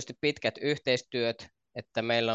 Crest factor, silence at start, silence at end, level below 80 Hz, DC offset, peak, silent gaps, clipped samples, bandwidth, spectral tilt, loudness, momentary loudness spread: 18 dB; 0 s; 0 s; -68 dBFS; under 0.1%; -12 dBFS; none; under 0.1%; 8.2 kHz; -4.5 dB/octave; -30 LUFS; 15 LU